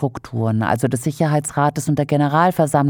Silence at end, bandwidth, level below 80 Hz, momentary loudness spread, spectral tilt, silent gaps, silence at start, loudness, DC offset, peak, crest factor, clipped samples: 0 s; 18 kHz; -52 dBFS; 5 LU; -6.5 dB/octave; none; 0 s; -19 LUFS; under 0.1%; -2 dBFS; 14 dB; under 0.1%